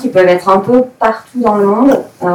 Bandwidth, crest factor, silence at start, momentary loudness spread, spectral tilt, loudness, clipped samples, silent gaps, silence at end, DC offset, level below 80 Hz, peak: 17.5 kHz; 10 dB; 0 s; 5 LU; -7 dB/octave; -11 LUFS; under 0.1%; none; 0 s; under 0.1%; -48 dBFS; 0 dBFS